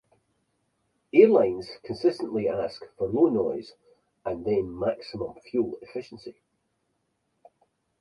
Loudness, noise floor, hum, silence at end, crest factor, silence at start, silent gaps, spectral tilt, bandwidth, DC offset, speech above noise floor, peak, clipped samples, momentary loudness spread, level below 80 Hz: -26 LUFS; -75 dBFS; none; 1.7 s; 22 dB; 1.15 s; none; -7.5 dB/octave; 10.5 kHz; under 0.1%; 50 dB; -6 dBFS; under 0.1%; 19 LU; -60 dBFS